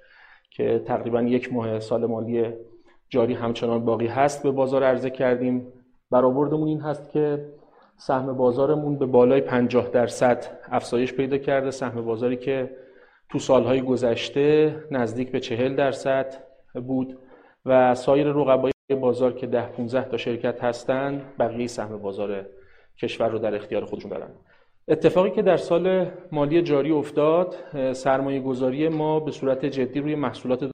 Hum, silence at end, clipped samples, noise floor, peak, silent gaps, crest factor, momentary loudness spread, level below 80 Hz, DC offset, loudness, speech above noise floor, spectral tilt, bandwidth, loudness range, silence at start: none; 0 s; under 0.1%; -53 dBFS; -4 dBFS; 18.73-18.88 s; 20 dB; 10 LU; -58 dBFS; under 0.1%; -23 LUFS; 30 dB; -6.5 dB/octave; 10 kHz; 5 LU; 0.6 s